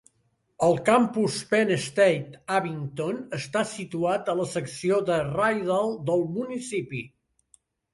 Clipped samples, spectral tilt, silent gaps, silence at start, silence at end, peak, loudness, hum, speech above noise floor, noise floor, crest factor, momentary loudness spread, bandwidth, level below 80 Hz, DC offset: under 0.1%; -5.5 dB/octave; none; 0.6 s; 0.85 s; -8 dBFS; -26 LUFS; none; 46 dB; -71 dBFS; 18 dB; 10 LU; 11.5 kHz; -64 dBFS; under 0.1%